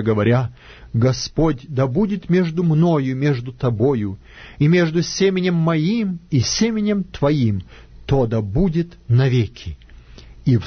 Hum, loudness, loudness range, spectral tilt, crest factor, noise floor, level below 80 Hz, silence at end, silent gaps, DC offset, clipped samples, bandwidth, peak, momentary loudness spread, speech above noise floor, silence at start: none; -19 LUFS; 2 LU; -6.5 dB/octave; 14 dB; -41 dBFS; -38 dBFS; 0 s; none; under 0.1%; under 0.1%; 6.6 kHz; -4 dBFS; 8 LU; 23 dB; 0 s